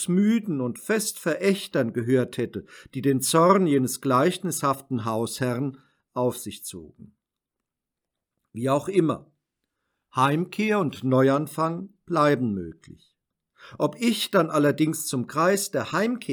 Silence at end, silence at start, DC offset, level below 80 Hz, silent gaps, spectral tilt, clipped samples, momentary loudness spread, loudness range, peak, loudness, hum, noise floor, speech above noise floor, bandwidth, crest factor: 0 s; 0 s; under 0.1%; -70 dBFS; none; -5 dB/octave; under 0.1%; 12 LU; 7 LU; -6 dBFS; -24 LUFS; none; -86 dBFS; 62 dB; over 20 kHz; 20 dB